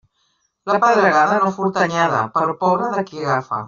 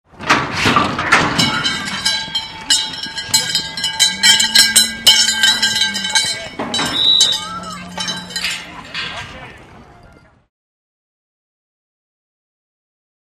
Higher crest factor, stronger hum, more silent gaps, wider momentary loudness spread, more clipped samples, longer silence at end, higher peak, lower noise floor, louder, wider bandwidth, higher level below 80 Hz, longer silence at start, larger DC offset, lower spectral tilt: about the same, 16 dB vs 18 dB; neither; neither; second, 8 LU vs 15 LU; neither; second, 0 s vs 3.45 s; about the same, -2 dBFS vs 0 dBFS; first, -66 dBFS vs -46 dBFS; second, -17 LUFS vs -13 LUFS; second, 7.6 kHz vs 15.5 kHz; second, -62 dBFS vs -48 dBFS; first, 0.65 s vs 0.15 s; neither; first, -4 dB/octave vs -0.5 dB/octave